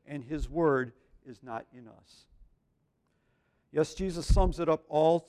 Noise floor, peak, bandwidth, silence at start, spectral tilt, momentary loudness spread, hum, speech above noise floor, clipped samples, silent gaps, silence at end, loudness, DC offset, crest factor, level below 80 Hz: -75 dBFS; -12 dBFS; 12 kHz; 0.1 s; -6.5 dB/octave; 15 LU; none; 45 dB; under 0.1%; none; 0.05 s; -31 LUFS; under 0.1%; 20 dB; -38 dBFS